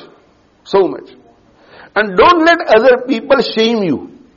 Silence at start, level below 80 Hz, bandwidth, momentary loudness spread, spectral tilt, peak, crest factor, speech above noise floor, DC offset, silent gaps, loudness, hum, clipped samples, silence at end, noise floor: 0.7 s; -46 dBFS; 7.2 kHz; 10 LU; -2.5 dB/octave; 0 dBFS; 14 dB; 39 dB; under 0.1%; none; -12 LUFS; none; under 0.1%; 0.3 s; -50 dBFS